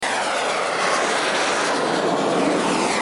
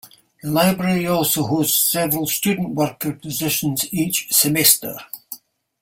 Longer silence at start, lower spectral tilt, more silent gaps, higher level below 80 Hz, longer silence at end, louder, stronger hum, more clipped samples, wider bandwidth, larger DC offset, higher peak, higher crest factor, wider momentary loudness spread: about the same, 0 s vs 0.05 s; about the same, -2.5 dB/octave vs -3.5 dB/octave; neither; about the same, -60 dBFS vs -56 dBFS; second, 0 s vs 0.45 s; about the same, -20 LUFS vs -18 LUFS; neither; neither; second, 11.5 kHz vs 16.5 kHz; neither; second, -6 dBFS vs 0 dBFS; second, 14 dB vs 20 dB; second, 2 LU vs 18 LU